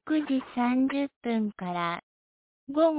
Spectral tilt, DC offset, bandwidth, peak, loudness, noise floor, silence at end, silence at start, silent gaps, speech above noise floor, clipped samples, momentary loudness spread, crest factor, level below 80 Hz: -5 dB/octave; under 0.1%; 4 kHz; -12 dBFS; -29 LUFS; under -90 dBFS; 0 s; 0.05 s; 1.16-1.21 s, 2.03-2.67 s; over 63 dB; under 0.1%; 7 LU; 16 dB; -70 dBFS